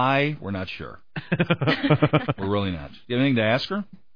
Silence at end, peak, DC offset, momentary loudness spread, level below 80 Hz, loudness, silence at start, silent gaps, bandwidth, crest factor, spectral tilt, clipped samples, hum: 0.3 s; -4 dBFS; 0.5%; 14 LU; -52 dBFS; -24 LUFS; 0 s; none; 5.2 kHz; 20 dB; -8 dB/octave; under 0.1%; none